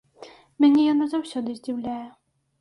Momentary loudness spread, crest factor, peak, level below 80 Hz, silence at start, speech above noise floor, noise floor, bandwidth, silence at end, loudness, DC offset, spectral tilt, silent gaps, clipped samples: 16 LU; 16 dB; -8 dBFS; -68 dBFS; 0.2 s; 26 dB; -48 dBFS; 11.5 kHz; 0.5 s; -23 LUFS; under 0.1%; -5.5 dB/octave; none; under 0.1%